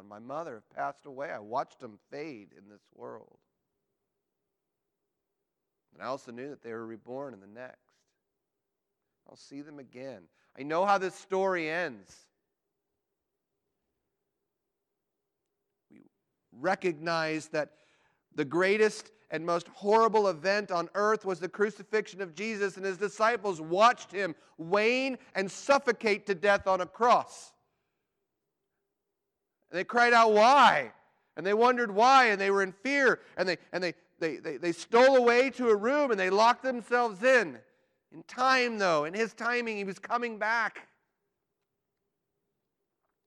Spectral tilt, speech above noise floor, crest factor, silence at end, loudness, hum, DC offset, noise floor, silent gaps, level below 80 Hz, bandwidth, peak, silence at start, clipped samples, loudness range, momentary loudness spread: -4 dB/octave; 58 dB; 20 dB; 2.45 s; -27 LUFS; none; under 0.1%; -86 dBFS; none; -78 dBFS; 11.5 kHz; -10 dBFS; 0.1 s; under 0.1%; 18 LU; 20 LU